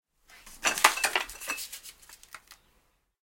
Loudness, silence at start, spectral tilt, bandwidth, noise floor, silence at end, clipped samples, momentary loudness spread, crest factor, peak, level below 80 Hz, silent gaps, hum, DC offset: -27 LUFS; 0.35 s; 1.5 dB/octave; 17 kHz; -70 dBFS; 0.7 s; under 0.1%; 26 LU; 32 dB; -2 dBFS; -60 dBFS; none; none; under 0.1%